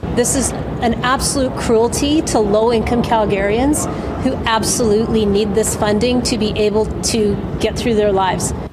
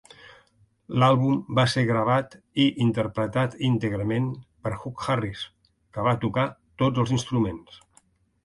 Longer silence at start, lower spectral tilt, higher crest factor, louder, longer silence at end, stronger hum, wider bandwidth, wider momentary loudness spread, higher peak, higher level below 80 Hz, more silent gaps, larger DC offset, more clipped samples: second, 0 s vs 0.9 s; second, -4.5 dB/octave vs -6.5 dB/octave; about the same, 14 dB vs 18 dB; first, -16 LUFS vs -25 LUFS; second, 0 s vs 0.7 s; neither; first, 15.5 kHz vs 11.5 kHz; second, 4 LU vs 11 LU; first, -2 dBFS vs -8 dBFS; first, -30 dBFS vs -54 dBFS; neither; neither; neither